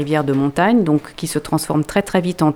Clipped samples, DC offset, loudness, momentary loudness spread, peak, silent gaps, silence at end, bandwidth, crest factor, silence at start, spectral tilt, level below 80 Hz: under 0.1%; under 0.1%; -18 LUFS; 5 LU; 0 dBFS; none; 0 s; 17.5 kHz; 16 dB; 0 s; -6 dB/octave; -46 dBFS